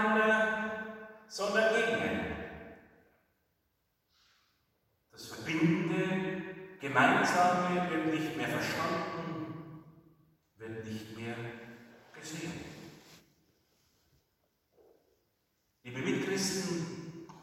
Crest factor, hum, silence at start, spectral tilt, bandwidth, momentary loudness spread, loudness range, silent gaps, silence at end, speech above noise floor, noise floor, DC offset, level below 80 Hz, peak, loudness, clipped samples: 22 dB; none; 0 s; -4.5 dB/octave; 16.5 kHz; 22 LU; 18 LU; none; 0 s; 47 dB; -79 dBFS; under 0.1%; -70 dBFS; -12 dBFS; -32 LUFS; under 0.1%